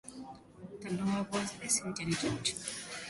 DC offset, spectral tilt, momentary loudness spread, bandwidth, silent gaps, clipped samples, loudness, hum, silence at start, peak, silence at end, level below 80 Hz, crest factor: under 0.1%; -3.5 dB/octave; 18 LU; 12 kHz; none; under 0.1%; -34 LUFS; none; 0.05 s; -16 dBFS; 0 s; -64 dBFS; 20 dB